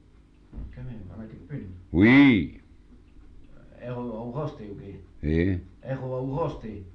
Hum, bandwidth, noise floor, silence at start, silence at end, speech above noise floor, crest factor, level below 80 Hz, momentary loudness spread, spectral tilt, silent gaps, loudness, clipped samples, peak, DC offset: none; 5.8 kHz; -54 dBFS; 0.55 s; 0.05 s; 30 dB; 20 dB; -44 dBFS; 24 LU; -8.5 dB/octave; none; -24 LUFS; under 0.1%; -8 dBFS; under 0.1%